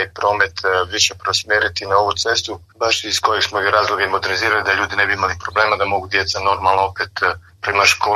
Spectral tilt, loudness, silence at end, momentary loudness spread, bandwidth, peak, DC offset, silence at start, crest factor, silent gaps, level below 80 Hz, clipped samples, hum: -1.5 dB/octave; -17 LUFS; 0 s; 4 LU; 13.5 kHz; 0 dBFS; under 0.1%; 0 s; 18 dB; none; -48 dBFS; under 0.1%; none